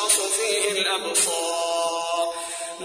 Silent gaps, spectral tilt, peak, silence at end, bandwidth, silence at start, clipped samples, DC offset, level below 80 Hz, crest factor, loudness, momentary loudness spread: none; 0.5 dB/octave; -6 dBFS; 0 s; 11 kHz; 0 s; under 0.1%; under 0.1%; -66 dBFS; 18 dB; -22 LUFS; 8 LU